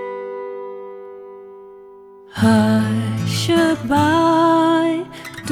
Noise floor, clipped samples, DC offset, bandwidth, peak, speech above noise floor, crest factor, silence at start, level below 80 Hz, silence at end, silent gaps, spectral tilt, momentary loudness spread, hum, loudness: -42 dBFS; under 0.1%; under 0.1%; 15.5 kHz; -2 dBFS; 27 dB; 16 dB; 0 s; -54 dBFS; 0 s; none; -6 dB/octave; 21 LU; none; -17 LUFS